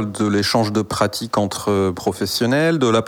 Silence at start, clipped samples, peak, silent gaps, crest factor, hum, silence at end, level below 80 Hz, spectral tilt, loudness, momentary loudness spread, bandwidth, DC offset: 0 s; under 0.1%; -2 dBFS; none; 16 dB; none; 0 s; -50 dBFS; -5 dB/octave; -19 LUFS; 5 LU; 19.5 kHz; under 0.1%